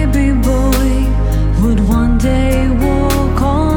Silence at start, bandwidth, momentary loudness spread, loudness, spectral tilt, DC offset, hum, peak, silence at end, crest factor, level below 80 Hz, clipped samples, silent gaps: 0 s; 19 kHz; 2 LU; -14 LUFS; -7 dB/octave; under 0.1%; none; 0 dBFS; 0 s; 10 dB; -14 dBFS; under 0.1%; none